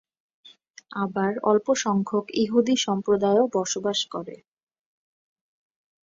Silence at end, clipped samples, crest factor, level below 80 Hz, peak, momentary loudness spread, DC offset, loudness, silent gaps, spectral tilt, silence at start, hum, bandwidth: 1.7 s; under 0.1%; 18 dB; -68 dBFS; -8 dBFS; 10 LU; under 0.1%; -24 LUFS; none; -4.5 dB/octave; 0.9 s; none; 7.8 kHz